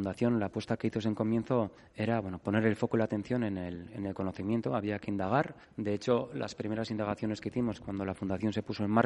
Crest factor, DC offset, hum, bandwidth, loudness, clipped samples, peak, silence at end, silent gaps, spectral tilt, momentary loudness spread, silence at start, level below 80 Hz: 24 dB; under 0.1%; none; 11 kHz; -33 LUFS; under 0.1%; -8 dBFS; 0 s; none; -7.5 dB/octave; 7 LU; 0 s; -64 dBFS